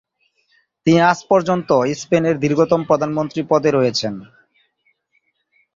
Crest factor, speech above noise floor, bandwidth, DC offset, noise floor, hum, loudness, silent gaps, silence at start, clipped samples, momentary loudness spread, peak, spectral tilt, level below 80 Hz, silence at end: 16 dB; 50 dB; 7.8 kHz; under 0.1%; -66 dBFS; none; -17 LUFS; none; 0.85 s; under 0.1%; 8 LU; -2 dBFS; -6 dB/octave; -58 dBFS; 1.5 s